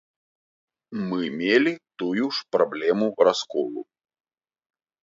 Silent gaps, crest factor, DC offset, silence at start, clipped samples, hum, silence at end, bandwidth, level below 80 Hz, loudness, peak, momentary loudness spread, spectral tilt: none; 22 dB; under 0.1%; 0.9 s; under 0.1%; none; 1.2 s; 7.6 kHz; -72 dBFS; -24 LUFS; -4 dBFS; 11 LU; -5 dB/octave